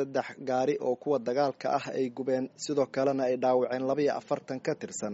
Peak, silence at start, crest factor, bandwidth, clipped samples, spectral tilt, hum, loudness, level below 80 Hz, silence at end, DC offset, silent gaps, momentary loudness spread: -14 dBFS; 0 s; 16 dB; 8 kHz; under 0.1%; -5 dB/octave; none; -30 LUFS; -76 dBFS; 0 s; under 0.1%; none; 6 LU